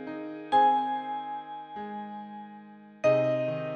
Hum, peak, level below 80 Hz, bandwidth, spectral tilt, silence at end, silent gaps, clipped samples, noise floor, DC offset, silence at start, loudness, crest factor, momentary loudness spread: none; -12 dBFS; -76 dBFS; 8.8 kHz; -7 dB/octave; 0 s; none; under 0.1%; -49 dBFS; under 0.1%; 0 s; -28 LUFS; 18 dB; 19 LU